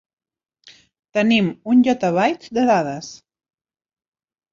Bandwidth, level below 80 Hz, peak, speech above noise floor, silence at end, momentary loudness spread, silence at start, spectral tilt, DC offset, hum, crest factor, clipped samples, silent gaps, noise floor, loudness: 7.4 kHz; -62 dBFS; -4 dBFS; 33 dB; 1.35 s; 11 LU; 1.15 s; -6 dB/octave; under 0.1%; none; 18 dB; under 0.1%; none; -50 dBFS; -18 LUFS